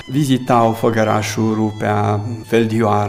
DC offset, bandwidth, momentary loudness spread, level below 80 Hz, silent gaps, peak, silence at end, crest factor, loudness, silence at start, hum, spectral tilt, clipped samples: under 0.1%; 16 kHz; 4 LU; -52 dBFS; none; -2 dBFS; 0 s; 14 dB; -17 LUFS; 0 s; none; -6.5 dB/octave; under 0.1%